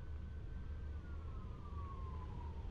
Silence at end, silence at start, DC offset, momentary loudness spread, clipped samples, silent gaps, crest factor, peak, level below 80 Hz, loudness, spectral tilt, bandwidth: 0 s; 0 s; under 0.1%; 2 LU; under 0.1%; none; 10 dB; -36 dBFS; -48 dBFS; -49 LUFS; -8.5 dB/octave; 6.2 kHz